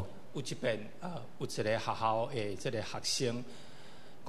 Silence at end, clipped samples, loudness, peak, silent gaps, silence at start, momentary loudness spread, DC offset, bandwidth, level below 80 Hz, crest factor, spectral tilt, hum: 0 s; under 0.1%; -36 LUFS; -18 dBFS; none; 0 s; 18 LU; 0.8%; 13.5 kHz; -68 dBFS; 20 dB; -4 dB/octave; none